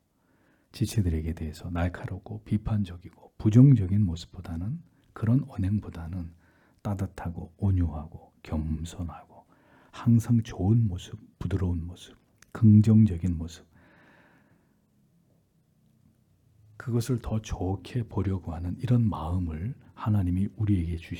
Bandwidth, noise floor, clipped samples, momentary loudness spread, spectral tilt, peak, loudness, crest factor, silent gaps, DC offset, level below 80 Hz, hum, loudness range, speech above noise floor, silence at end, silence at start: 13 kHz; -67 dBFS; under 0.1%; 18 LU; -8.5 dB/octave; -8 dBFS; -27 LUFS; 20 dB; none; under 0.1%; -48 dBFS; none; 8 LU; 41 dB; 0 s; 0.75 s